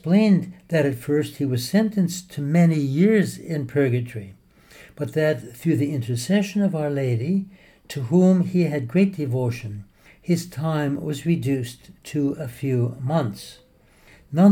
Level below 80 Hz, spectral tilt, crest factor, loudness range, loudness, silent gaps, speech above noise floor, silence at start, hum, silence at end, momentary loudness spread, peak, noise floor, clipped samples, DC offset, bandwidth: -58 dBFS; -7 dB/octave; 18 dB; 4 LU; -22 LUFS; none; 32 dB; 0.05 s; none; 0 s; 14 LU; -4 dBFS; -53 dBFS; under 0.1%; under 0.1%; 17.5 kHz